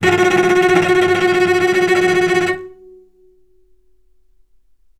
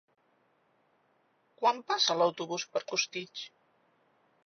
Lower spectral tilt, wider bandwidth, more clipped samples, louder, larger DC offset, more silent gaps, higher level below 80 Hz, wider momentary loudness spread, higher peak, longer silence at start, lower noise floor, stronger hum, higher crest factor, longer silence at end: first, -4.5 dB/octave vs -0.5 dB/octave; first, 13.5 kHz vs 6.6 kHz; neither; first, -14 LUFS vs -30 LUFS; neither; neither; first, -52 dBFS vs under -90 dBFS; second, 4 LU vs 16 LU; first, 0 dBFS vs -12 dBFS; second, 0 s vs 1.6 s; second, -58 dBFS vs -71 dBFS; neither; second, 16 dB vs 22 dB; first, 2.3 s vs 1 s